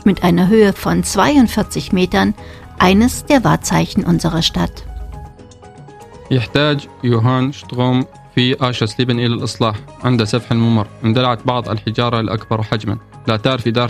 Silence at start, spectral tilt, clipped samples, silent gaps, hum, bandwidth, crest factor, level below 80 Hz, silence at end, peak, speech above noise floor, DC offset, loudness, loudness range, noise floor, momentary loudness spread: 0 s; -5.5 dB/octave; under 0.1%; none; none; 15 kHz; 16 dB; -36 dBFS; 0 s; 0 dBFS; 24 dB; under 0.1%; -16 LUFS; 5 LU; -38 dBFS; 9 LU